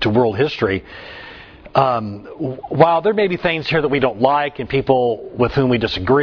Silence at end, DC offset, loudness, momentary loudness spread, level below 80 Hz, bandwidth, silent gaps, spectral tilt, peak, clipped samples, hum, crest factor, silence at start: 0 s; under 0.1%; -18 LUFS; 13 LU; -44 dBFS; 5.4 kHz; none; -8 dB/octave; 0 dBFS; under 0.1%; none; 18 dB; 0 s